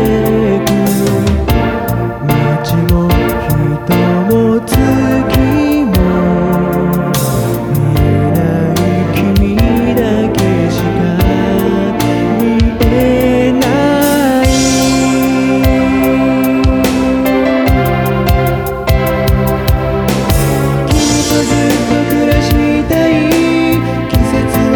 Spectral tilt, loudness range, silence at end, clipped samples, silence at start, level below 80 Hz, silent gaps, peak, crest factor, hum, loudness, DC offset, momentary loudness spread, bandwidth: -6 dB/octave; 2 LU; 0 s; under 0.1%; 0 s; -22 dBFS; none; 0 dBFS; 10 dB; none; -11 LUFS; under 0.1%; 3 LU; 19.5 kHz